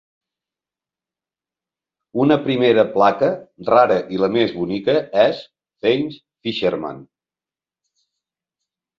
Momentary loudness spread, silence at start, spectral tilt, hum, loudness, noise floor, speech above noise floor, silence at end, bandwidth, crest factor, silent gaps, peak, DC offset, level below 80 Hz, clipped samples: 13 LU; 2.15 s; -7.5 dB/octave; none; -18 LUFS; under -90 dBFS; over 73 dB; 1.95 s; 7.2 kHz; 18 dB; none; -2 dBFS; under 0.1%; -60 dBFS; under 0.1%